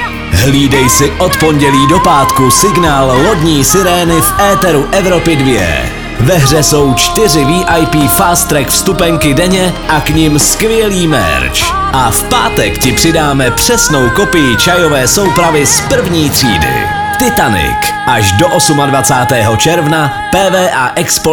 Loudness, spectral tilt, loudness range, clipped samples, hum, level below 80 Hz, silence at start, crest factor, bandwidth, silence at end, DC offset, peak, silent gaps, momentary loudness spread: -8 LUFS; -4 dB/octave; 2 LU; 0.4%; none; -24 dBFS; 0 s; 8 dB; over 20 kHz; 0 s; 0.2%; 0 dBFS; none; 4 LU